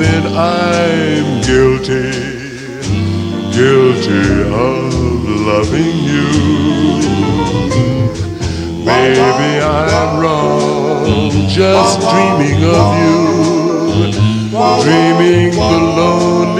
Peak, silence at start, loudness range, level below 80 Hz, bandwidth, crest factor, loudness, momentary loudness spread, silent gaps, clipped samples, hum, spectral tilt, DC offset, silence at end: 0 dBFS; 0 s; 3 LU; -30 dBFS; 11.5 kHz; 12 dB; -12 LUFS; 7 LU; none; under 0.1%; none; -6 dB/octave; under 0.1%; 0 s